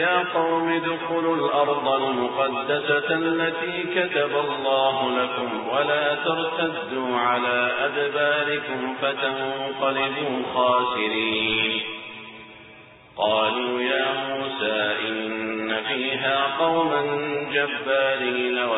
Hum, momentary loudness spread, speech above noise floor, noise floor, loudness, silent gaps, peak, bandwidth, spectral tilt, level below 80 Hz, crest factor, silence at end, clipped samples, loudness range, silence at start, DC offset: none; 6 LU; 24 dB; -47 dBFS; -23 LUFS; none; -8 dBFS; 4.1 kHz; -8.5 dB/octave; -64 dBFS; 16 dB; 0 s; under 0.1%; 2 LU; 0 s; under 0.1%